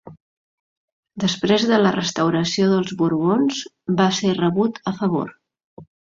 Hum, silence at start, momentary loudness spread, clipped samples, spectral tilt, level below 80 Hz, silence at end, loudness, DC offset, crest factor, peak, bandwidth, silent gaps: none; 0.05 s; 7 LU; under 0.1%; -5.5 dB/octave; -60 dBFS; 0.3 s; -20 LUFS; under 0.1%; 18 dB; -4 dBFS; 7.6 kHz; 0.20-1.03 s, 5.64-5.77 s